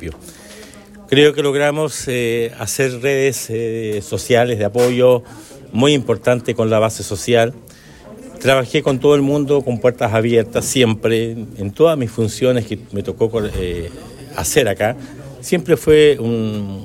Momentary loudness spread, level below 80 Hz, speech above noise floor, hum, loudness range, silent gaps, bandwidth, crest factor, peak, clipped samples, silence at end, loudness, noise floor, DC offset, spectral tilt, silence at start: 13 LU; -42 dBFS; 23 dB; none; 3 LU; none; 16.5 kHz; 16 dB; 0 dBFS; under 0.1%; 0 s; -16 LUFS; -39 dBFS; under 0.1%; -5 dB/octave; 0 s